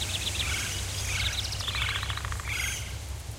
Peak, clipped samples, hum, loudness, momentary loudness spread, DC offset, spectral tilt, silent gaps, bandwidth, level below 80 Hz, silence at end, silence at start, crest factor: -14 dBFS; under 0.1%; none; -30 LUFS; 5 LU; under 0.1%; -2 dB/octave; none; 16 kHz; -38 dBFS; 0 s; 0 s; 18 dB